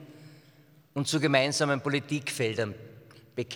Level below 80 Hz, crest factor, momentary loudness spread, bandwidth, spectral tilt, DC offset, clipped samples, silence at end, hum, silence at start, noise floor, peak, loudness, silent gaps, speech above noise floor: -76 dBFS; 24 dB; 14 LU; 18 kHz; -4.5 dB/octave; under 0.1%; under 0.1%; 0 s; none; 0 s; -59 dBFS; -8 dBFS; -28 LUFS; none; 31 dB